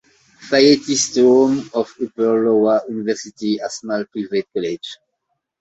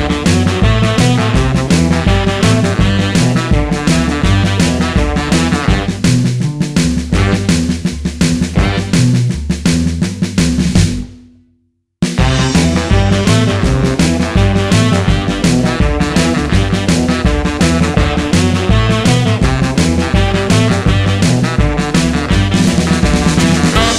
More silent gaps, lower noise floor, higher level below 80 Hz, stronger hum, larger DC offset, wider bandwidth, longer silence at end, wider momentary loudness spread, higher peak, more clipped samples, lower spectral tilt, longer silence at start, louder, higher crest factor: neither; first, -74 dBFS vs -60 dBFS; second, -62 dBFS vs -20 dBFS; neither; neither; second, 8.2 kHz vs 13.5 kHz; first, 0.65 s vs 0 s; first, 11 LU vs 3 LU; about the same, -2 dBFS vs 0 dBFS; neither; second, -3.5 dB/octave vs -5.5 dB/octave; first, 0.4 s vs 0 s; second, -18 LUFS vs -12 LUFS; about the same, 16 dB vs 12 dB